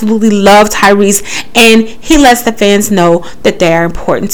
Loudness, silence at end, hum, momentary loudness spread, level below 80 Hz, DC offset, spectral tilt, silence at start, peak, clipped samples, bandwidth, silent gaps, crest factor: -7 LUFS; 0 s; none; 7 LU; -28 dBFS; 8%; -4 dB/octave; 0 s; 0 dBFS; 8%; over 20 kHz; none; 8 dB